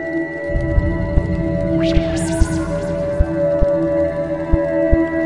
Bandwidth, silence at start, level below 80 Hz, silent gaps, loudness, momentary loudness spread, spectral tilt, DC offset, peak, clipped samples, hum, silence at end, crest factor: 11.5 kHz; 0 s; -24 dBFS; none; -19 LUFS; 5 LU; -7 dB/octave; under 0.1%; 0 dBFS; under 0.1%; none; 0 s; 16 dB